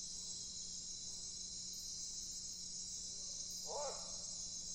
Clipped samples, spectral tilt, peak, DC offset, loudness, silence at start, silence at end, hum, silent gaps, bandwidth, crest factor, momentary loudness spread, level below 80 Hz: under 0.1%; -0.5 dB/octave; -32 dBFS; under 0.1%; -44 LUFS; 0 s; 0 s; 60 Hz at -70 dBFS; none; 16 kHz; 16 dB; 2 LU; -66 dBFS